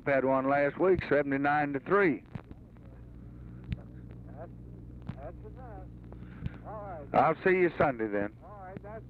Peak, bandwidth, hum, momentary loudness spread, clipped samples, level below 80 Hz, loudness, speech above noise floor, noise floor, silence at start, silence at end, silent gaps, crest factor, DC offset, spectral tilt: -12 dBFS; 5 kHz; none; 21 LU; under 0.1%; -52 dBFS; -28 LUFS; 22 dB; -50 dBFS; 0 s; 0 s; none; 20 dB; under 0.1%; -9 dB/octave